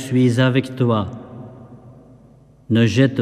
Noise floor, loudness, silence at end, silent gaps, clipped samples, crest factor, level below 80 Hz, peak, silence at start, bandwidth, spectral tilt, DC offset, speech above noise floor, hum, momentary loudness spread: -48 dBFS; -18 LUFS; 0 s; none; under 0.1%; 16 dB; -56 dBFS; -4 dBFS; 0 s; 12 kHz; -7 dB/octave; under 0.1%; 32 dB; none; 22 LU